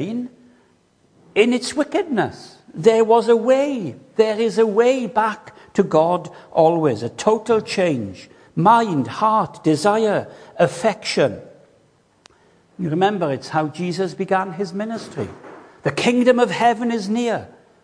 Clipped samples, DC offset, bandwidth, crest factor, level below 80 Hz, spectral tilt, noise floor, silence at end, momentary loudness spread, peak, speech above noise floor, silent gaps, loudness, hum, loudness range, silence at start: under 0.1%; under 0.1%; 10.5 kHz; 18 dB; -64 dBFS; -5.5 dB/octave; -58 dBFS; 0.35 s; 12 LU; -2 dBFS; 40 dB; none; -19 LUFS; none; 5 LU; 0 s